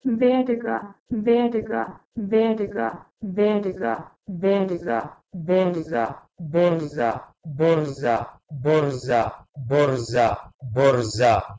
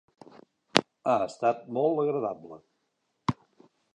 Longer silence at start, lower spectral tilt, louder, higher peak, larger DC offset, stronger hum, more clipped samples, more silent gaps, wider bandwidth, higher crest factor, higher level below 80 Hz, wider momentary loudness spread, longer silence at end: second, 0.05 s vs 0.75 s; first, -7 dB/octave vs -4.5 dB/octave; first, -23 LUFS vs -28 LUFS; second, -4 dBFS vs 0 dBFS; neither; neither; neither; first, 1.00-1.06 s, 2.05-2.12 s, 10.54-10.59 s vs none; second, 8 kHz vs 11.5 kHz; second, 18 dB vs 30 dB; first, -52 dBFS vs -66 dBFS; about the same, 12 LU vs 13 LU; second, 0 s vs 0.6 s